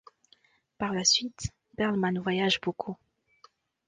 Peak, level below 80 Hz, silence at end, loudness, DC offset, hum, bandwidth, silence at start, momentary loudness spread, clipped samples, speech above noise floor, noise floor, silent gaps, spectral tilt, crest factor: -10 dBFS; -58 dBFS; 0.95 s; -28 LUFS; under 0.1%; none; 10 kHz; 0.8 s; 16 LU; under 0.1%; 37 dB; -65 dBFS; none; -3 dB/octave; 22 dB